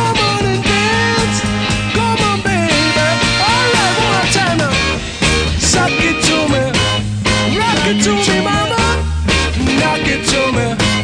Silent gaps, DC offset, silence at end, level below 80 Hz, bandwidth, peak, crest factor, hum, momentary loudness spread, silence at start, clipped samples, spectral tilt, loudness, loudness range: none; under 0.1%; 0 s; -26 dBFS; 10 kHz; -2 dBFS; 12 dB; none; 3 LU; 0 s; under 0.1%; -3.5 dB/octave; -13 LUFS; 1 LU